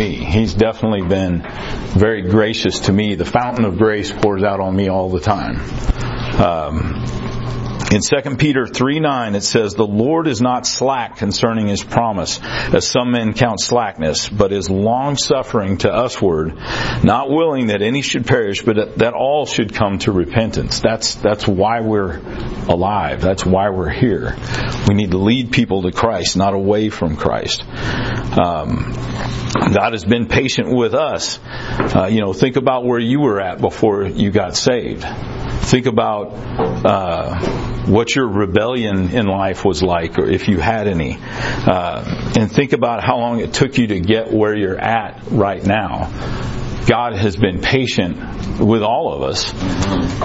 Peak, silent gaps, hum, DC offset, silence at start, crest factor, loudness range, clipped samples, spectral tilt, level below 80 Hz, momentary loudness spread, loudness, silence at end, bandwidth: 0 dBFS; none; none; under 0.1%; 0 s; 16 dB; 2 LU; under 0.1%; -5.5 dB/octave; -32 dBFS; 7 LU; -17 LUFS; 0 s; 8 kHz